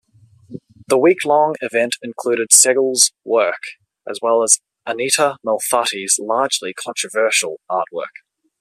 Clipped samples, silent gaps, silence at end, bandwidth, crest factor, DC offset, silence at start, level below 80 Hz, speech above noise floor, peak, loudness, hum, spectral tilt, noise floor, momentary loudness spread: under 0.1%; none; 0.5 s; 14.5 kHz; 18 dB; under 0.1%; 0.5 s; -70 dBFS; 32 dB; 0 dBFS; -16 LUFS; none; -1 dB/octave; -49 dBFS; 13 LU